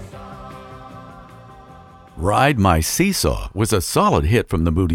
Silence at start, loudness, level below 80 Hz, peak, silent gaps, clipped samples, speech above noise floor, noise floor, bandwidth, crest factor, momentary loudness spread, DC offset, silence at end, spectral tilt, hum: 0 s; -18 LUFS; -32 dBFS; -2 dBFS; none; under 0.1%; 26 dB; -43 dBFS; 17 kHz; 18 dB; 22 LU; under 0.1%; 0 s; -5 dB/octave; none